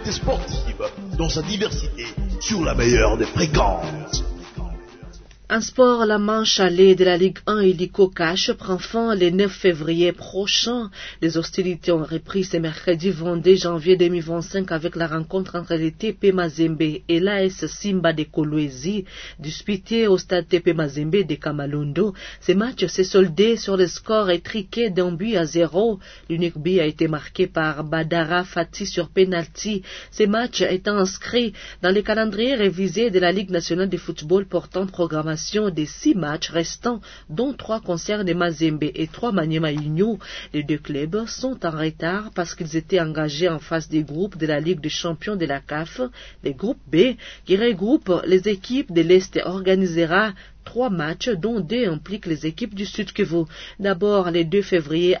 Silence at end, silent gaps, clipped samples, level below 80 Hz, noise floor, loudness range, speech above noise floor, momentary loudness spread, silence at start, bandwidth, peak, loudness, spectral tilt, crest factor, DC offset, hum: 0 s; none; under 0.1%; -38 dBFS; -41 dBFS; 5 LU; 20 dB; 9 LU; 0 s; 6.6 kHz; -2 dBFS; -21 LUFS; -5 dB/octave; 18 dB; under 0.1%; none